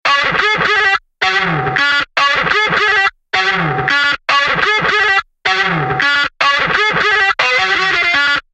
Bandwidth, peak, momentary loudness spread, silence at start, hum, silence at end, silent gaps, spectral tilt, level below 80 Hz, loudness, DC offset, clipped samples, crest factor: 9.8 kHz; 0 dBFS; 3 LU; 0.05 s; none; 0.15 s; none; -3 dB/octave; -44 dBFS; -12 LUFS; under 0.1%; under 0.1%; 14 dB